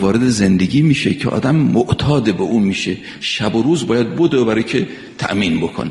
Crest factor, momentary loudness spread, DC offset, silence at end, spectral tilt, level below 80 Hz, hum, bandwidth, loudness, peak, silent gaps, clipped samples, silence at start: 14 dB; 7 LU; under 0.1%; 0 s; -6 dB/octave; -44 dBFS; none; 11.5 kHz; -16 LUFS; -2 dBFS; none; under 0.1%; 0 s